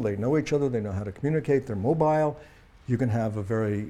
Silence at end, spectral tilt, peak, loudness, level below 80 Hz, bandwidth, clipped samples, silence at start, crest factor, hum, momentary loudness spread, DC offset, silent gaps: 0 s; -8.5 dB/octave; -10 dBFS; -26 LUFS; -54 dBFS; 10.5 kHz; under 0.1%; 0 s; 16 dB; none; 8 LU; under 0.1%; none